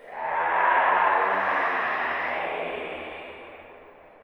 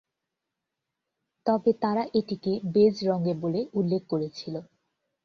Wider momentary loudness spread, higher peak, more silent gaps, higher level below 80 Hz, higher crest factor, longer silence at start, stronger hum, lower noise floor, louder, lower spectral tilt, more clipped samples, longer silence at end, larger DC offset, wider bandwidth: first, 18 LU vs 11 LU; about the same, -8 dBFS vs -10 dBFS; neither; about the same, -66 dBFS vs -68 dBFS; about the same, 18 dB vs 18 dB; second, 0 s vs 1.45 s; neither; second, -49 dBFS vs -85 dBFS; first, -24 LUFS vs -27 LUFS; second, -5 dB/octave vs -8 dB/octave; neither; second, 0.35 s vs 0.6 s; neither; first, 19 kHz vs 6.8 kHz